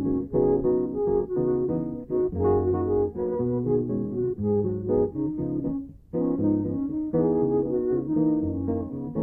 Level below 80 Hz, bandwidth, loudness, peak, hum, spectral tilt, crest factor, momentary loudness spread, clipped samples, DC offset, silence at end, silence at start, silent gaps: -46 dBFS; 2.2 kHz; -26 LUFS; -12 dBFS; none; -14 dB/octave; 12 dB; 6 LU; under 0.1%; under 0.1%; 0 s; 0 s; none